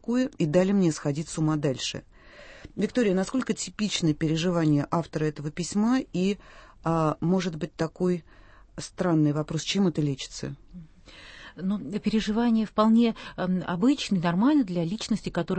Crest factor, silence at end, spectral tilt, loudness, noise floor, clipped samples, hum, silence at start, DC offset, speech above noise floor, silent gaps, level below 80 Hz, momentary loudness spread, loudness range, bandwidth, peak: 18 dB; 0 s; -6 dB/octave; -26 LUFS; -48 dBFS; under 0.1%; none; 0.1 s; under 0.1%; 23 dB; none; -52 dBFS; 11 LU; 4 LU; 8.8 kHz; -8 dBFS